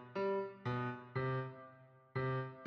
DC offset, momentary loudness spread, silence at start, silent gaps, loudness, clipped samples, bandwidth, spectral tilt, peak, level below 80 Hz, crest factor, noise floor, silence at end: under 0.1%; 10 LU; 0 s; none; -41 LUFS; under 0.1%; 6 kHz; -9 dB/octave; -28 dBFS; -72 dBFS; 14 dB; -61 dBFS; 0 s